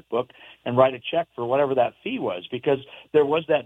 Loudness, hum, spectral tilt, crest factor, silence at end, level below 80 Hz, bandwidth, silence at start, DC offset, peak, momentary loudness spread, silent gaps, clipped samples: -24 LUFS; none; -8 dB/octave; 20 dB; 0 s; -68 dBFS; 3.9 kHz; 0.1 s; under 0.1%; -4 dBFS; 8 LU; none; under 0.1%